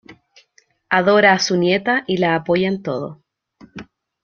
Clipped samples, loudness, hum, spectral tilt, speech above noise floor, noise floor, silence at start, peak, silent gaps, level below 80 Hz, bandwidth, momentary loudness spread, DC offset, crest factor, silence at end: under 0.1%; -17 LUFS; none; -4.5 dB/octave; 42 dB; -59 dBFS; 0.1 s; -2 dBFS; none; -58 dBFS; 7.2 kHz; 22 LU; under 0.1%; 18 dB; 0.4 s